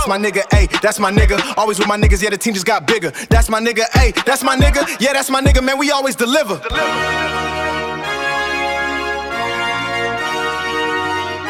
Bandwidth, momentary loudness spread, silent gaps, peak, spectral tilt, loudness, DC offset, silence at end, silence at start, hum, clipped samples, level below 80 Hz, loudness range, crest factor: 16.5 kHz; 6 LU; none; 0 dBFS; -4 dB/octave; -16 LUFS; under 0.1%; 0 s; 0 s; none; under 0.1%; -22 dBFS; 4 LU; 16 dB